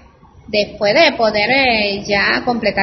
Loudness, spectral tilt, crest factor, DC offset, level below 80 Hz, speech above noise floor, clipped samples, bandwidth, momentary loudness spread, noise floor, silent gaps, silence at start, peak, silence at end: -14 LUFS; -4 dB/octave; 16 dB; under 0.1%; -44 dBFS; 27 dB; under 0.1%; 6.2 kHz; 7 LU; -42 dBFS; none; 0.5 s; 0 dBFS; 0 s